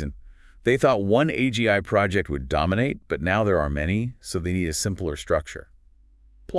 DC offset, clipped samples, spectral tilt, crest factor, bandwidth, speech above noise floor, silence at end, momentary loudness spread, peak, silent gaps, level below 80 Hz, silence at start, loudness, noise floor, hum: under 0.1%; under 0.1%; -5.5 dB/octave; 18 dB; 12 kHz; 31 dB; 0 s; 9 LU; -6 dBFS; none; -40 dBFS; 0 s; -23 LUFS; -54 dBFS; none